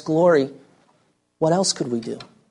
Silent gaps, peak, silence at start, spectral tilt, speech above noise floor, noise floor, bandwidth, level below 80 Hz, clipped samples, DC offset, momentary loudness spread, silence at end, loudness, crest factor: none; -6 dBFS; 0.05 s; -4.5 dB/octave; 45 dB; -64 dBFS; 11.5 kHz; -66 dBFS; under 0.1%; under 0.1%; 15 LU; 0.25 s; -21 LUFS; 16 dB